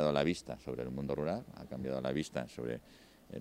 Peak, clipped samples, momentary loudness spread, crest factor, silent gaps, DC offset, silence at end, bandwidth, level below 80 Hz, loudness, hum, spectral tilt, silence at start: -16 dBFS; under 0.1%; 9 LU; 20 dB; none; under 0.1%; 0 s; 16 kHz; -60 dBFS; -38 LUFS; none; -6 dB/octave; 0 s